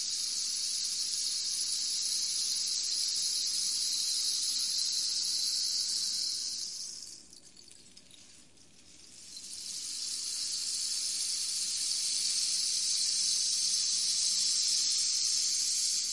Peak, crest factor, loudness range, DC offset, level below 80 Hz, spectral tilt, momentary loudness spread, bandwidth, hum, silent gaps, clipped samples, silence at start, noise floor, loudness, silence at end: -16 dBFS; 16 dB; 12 LU; 0.1%; -76 dBFS; 3.5 dB/octave; 9 LU; 11.5 kHz; none; none; under 0.1%; 0 s; -59 dBFS; -29 LUFS; 0 s